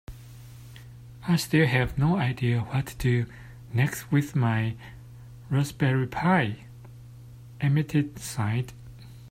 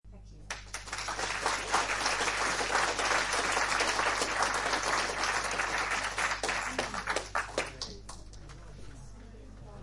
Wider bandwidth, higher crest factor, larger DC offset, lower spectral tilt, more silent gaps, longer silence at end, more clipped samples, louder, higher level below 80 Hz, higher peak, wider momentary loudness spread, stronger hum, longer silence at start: first, 16 kHz vs 11.5 kHz; about the same, 18 dB vs 20 dB; neither; first, -6.5 dB/octave vs -1 dB/octave; neither; about the same, 0 s vs 0 s; neither; first, -26 LUFS vs -30 LUFS; about the same, -50 dBFS vs -50 dBFS; first, -10 dBFS vs -14 dBFS; about the same, 23 LU vs 22 LU; neither; about the same, 0.1 s vs 0.05 s